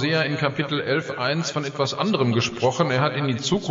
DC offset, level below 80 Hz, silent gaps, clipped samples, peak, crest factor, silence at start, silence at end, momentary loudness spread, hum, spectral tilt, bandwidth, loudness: under 0.1%; -58 dBFS; none; under 0.1%; -6 dBFS; 16 dB; 0 s; 0 s; 4 LU; none; -5 dB/octave; 8 kHz; -23 LUFS